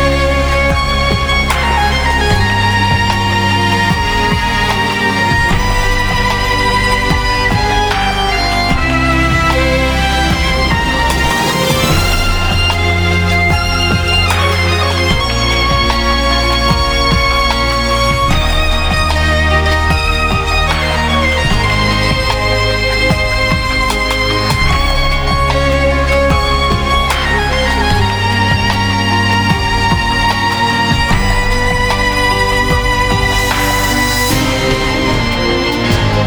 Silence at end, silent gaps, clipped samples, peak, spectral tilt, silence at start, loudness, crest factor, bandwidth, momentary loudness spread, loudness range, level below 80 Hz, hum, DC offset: 0 s; none; under 0.1%; 0 dBFS; -4.5 dB/octave; 0 s; -12 LUFS; 12 dB; over 20 kHz; 2 LU; 1 LU; -18 dBFS; none; under 0.1%